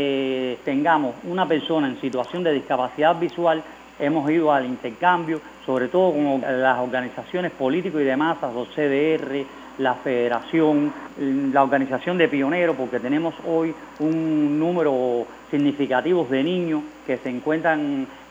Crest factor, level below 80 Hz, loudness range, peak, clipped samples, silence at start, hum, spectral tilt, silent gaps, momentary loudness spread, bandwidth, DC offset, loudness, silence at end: 20 dB; -62 dBFS; 2 LU; -2 dBFS; under 0.1%; 0 s; none; -7 dB/octave; none; 8 LU; 8 kHz; under 0.1%; -22 LUFS; 0.05 s